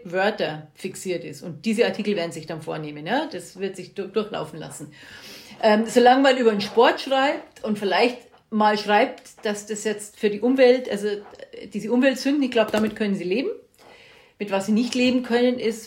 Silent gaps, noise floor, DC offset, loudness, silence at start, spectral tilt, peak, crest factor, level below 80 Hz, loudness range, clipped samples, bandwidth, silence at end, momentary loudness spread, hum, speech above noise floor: none; -50 dBFS; under 0.1%; -22 LUFS; 0 s; -4.5 dB/octave; -4 dBFS; 18 dB; -66 dBFS; 7 LU; under 0.1%; 16 kHz; 0 s; 17 LU; none; 28 dB